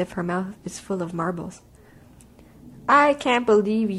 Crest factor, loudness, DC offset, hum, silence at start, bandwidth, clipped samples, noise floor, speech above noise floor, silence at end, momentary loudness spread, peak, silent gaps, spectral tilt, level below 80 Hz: 18 dB; -22 LUFS; under 0.1%; none; 0 s; 13 kHz; under 0.1%; -50 dBFS; 28 dB; 0 s; 16 LU; -6 dBFS; none; -5.5 dB/octave; -56 dBFS